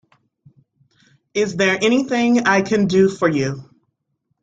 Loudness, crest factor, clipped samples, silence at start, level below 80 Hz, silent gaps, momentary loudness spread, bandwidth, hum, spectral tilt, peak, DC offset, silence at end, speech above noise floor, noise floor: -17 LUFS; 16 dB; under 0.1%; 1.35 s; -58 dBFS; none; 9 LU; 9.2 kHz; none; -5.5 dB/octave; -2 dBFS; under 0.1%; 0.8 s; 55 dB; -72 dBFS